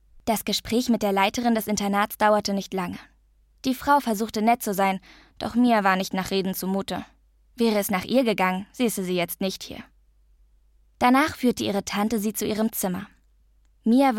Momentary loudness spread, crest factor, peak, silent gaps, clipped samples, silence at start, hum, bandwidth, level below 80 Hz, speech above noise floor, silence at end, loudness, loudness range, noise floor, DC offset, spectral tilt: 10 LU; 18 dB; -6 dBFS; none; under 0.1%; 0.15 s; none; 17 kHz; -54 dBFS; 37 dB; 0 s; -24 LUFS; 2 LU; -60 dBFS; under 0.1%; -4.5 dB/octave